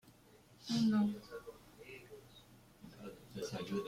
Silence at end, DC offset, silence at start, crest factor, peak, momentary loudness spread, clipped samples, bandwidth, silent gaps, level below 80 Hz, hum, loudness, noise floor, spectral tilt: 0 s; under 0.1%; 0.05 s; 16 dB; -24 dBFS; 25 LU; under 0.1%; 15.5 kHz; none; -70 dBFS; none; -37 LUFS; -64 dBFS; -6 dB/octave